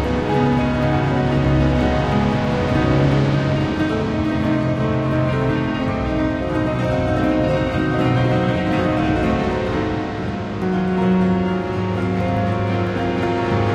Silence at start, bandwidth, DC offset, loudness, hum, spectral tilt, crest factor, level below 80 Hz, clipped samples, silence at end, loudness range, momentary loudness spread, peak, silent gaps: 0 s; 9.2 kHz; under 0.1%; -19 LUFS; none; -8 dB/octave; 14 dB; -32 dBFS; under 0.1%; 0 s; 2 LU; 4 LU; -4 dBFS; none